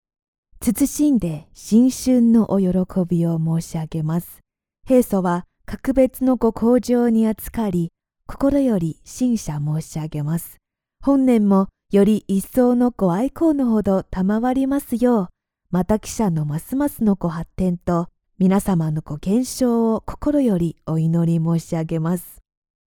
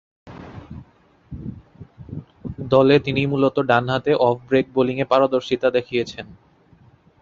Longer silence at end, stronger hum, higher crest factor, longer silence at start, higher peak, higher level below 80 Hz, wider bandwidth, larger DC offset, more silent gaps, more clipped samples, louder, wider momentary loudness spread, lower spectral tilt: second, 0.55 s vs 0.9 s; neither; about the same, 16 dB vs 20 dB; first, 0.6 s vs 0.25 s; about the same, -4 dBFS vs -2 dBFS; first, -42 dBFS vs -50 dBFS; first, 19.5 kHz vs 7.4 kHz; neither; neither; neither; about the same, -20 LUFS vs -19 LUFS; second, 9 LU vs 22 LU; about the same, -7.5 dB/octave vs -7 dB/octave